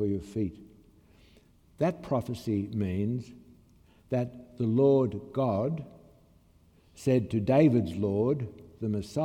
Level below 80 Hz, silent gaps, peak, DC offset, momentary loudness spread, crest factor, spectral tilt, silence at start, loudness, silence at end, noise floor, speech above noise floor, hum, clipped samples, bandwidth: -60 dBFS; none; -12 dBFS; under 0.1%; 13 LU; 18 dB; -8.5 dB/octave; 0 s; -29 LUFS; 0 s; -61 dBFS; 33 dB; none; under 0.1%; 14.5 kHz